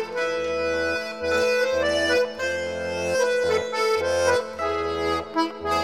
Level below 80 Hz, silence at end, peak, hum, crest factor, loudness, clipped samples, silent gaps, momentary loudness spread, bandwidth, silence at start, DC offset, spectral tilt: -50 dBFS; 0 s; -8 dBFS; none; 16 dB; -24 LUFS; under 0.1%; none; 5 LU; 15 kHz; 0 s; 0.2%; -3.5 dB/octave